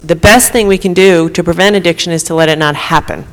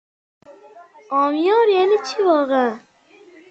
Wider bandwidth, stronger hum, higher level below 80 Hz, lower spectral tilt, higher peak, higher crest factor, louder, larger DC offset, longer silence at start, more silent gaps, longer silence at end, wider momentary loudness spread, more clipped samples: first, 20 kHz vs 8 kHz; neither; first, -30 dBFS vs -70 dBFS; about the same, -4 dB/octave vs -3.5 dB/octave; first, 0 dBFS vs -4 dBFS; second, 10 dB vs 16 dB; first, -9 LUFS vs -17 LUFS; neither; second, 0.05 s vs 0.5 s; neither; second, 0.05 s vs 0.7 s; about the same, 7 LU vs 9 LU; first, 0.2% vs under 0.1%